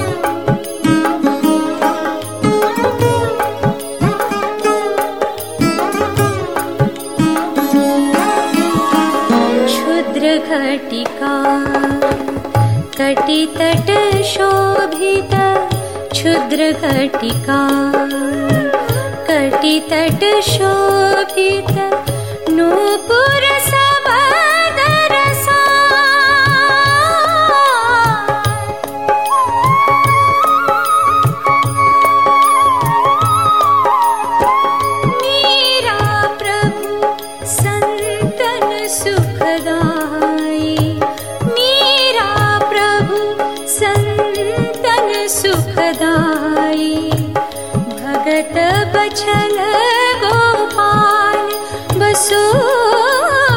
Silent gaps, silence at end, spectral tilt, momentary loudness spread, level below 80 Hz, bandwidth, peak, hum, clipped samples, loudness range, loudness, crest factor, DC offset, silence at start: none; 0 s; -4.5 dB/octave; 8 LU; -42 dBFS; 19 kHz; 0 dBFS; none; under 0.1%; 5 LU; -13 LUFS; 12 dB; 1%; 0 s